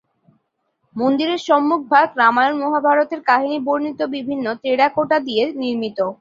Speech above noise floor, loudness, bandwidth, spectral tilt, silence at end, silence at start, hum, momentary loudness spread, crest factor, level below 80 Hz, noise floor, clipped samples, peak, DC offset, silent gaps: 52 dB; -18 LUFS; 7.6 kHz; -5 dB/octave; 0.05 s; 0.95 s; none; 8 LU; 18 dB; -66 dBFS; -70 dBFS; under 0.1%; 0 dBFS; under 0.1%; none